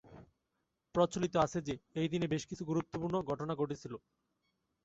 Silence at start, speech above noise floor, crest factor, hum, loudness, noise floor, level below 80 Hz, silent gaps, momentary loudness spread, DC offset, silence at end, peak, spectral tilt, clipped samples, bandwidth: 0.05 s; 49 dB; 20 dB; none; -36 LUFS; -84 dBFS; -64 dBFS; none; 8 LU; under 0.1%; 0.85 s; -16 dBFS; -6 dB/octave; under 0.1%; 8 kHz